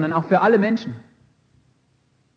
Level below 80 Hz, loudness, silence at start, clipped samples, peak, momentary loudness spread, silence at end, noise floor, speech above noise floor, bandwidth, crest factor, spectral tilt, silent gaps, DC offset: -68 dBFS; -18 LUFS; 0 s; under 0.1%; -4 dBFS; 19 LU; 1.35 s; -63 dBFS; 44 dB; 7 kHz; 18 dB; -8 dB/octave; none; under 0.1%